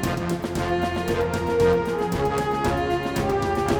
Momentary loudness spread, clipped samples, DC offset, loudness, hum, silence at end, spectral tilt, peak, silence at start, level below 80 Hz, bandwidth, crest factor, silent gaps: 5 LU; under 0.1%; under 0.1%; -24 LUFS; none; 0 s; -6 dB/octave; -8 dBFS; 0 s; -38 dBFS; 19.5 kHz; 16 dB; none